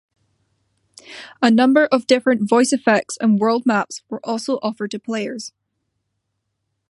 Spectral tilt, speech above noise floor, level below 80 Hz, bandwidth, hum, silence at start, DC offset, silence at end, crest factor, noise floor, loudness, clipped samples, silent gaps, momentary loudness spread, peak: -4.5 dB/octave; 57 dB; -72 dBFS; 11.5 kHz; none; 1.1 s; under 0.1%; 1.4 s; 18 dB; -75 dBFS; -18 LUFS; under 0.1%; none; 16 LU; -2 dBFS